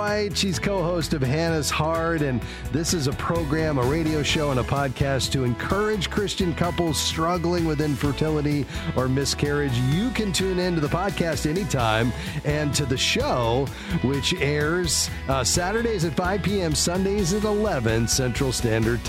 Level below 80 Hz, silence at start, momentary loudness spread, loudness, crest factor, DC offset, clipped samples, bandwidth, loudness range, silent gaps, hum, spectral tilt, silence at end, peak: -36 dBFS; 0 s; 3 LU; -23 LUFS; 16 dB; under 0.1%; under 0.1%; 16.5 kHz; 1 LU; none; none; -4.5 dB/octave; 0 s; -6 dBFS